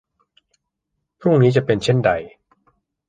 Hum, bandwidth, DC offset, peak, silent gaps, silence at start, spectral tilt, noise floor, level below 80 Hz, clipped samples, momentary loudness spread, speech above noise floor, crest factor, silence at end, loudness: none; 9.2 kHz; under 0.1%; -2 dBFS; none; 1.2 s; -7 dB/octave; -77 dBFS; -52 dBFS; under 0.1%; 8 LU; 61 dB; 18 dB; 0.8 s; -18 LUFS